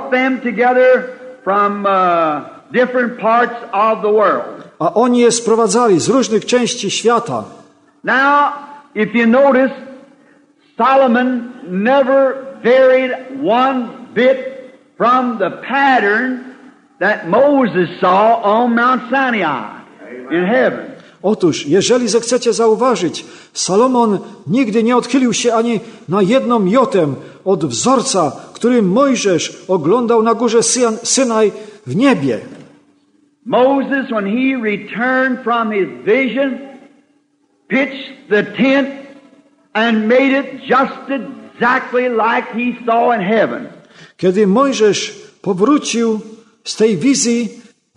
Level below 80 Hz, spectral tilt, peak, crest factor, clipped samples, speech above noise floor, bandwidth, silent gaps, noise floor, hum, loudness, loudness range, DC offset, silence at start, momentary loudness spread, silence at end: -64 dBFS; -4 dB/octave; 0 dBFS; 14 dB; under 0.1%; 45 dB; 10.5 kHz; none; -59 dBFS; none; -14 LUFS; 3 LU; under 0.1%; 0 s; 11 LU; 0.35 s